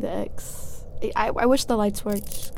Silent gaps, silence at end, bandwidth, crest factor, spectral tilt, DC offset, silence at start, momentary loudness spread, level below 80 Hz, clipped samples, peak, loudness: none; 0 s; 17 kHz; 16 dB; -4.5 dB/octave; under 0.1%; 0 s; 16 LU; -38 dBFS; under 0.1%; -8 dBFS; -25 LUFS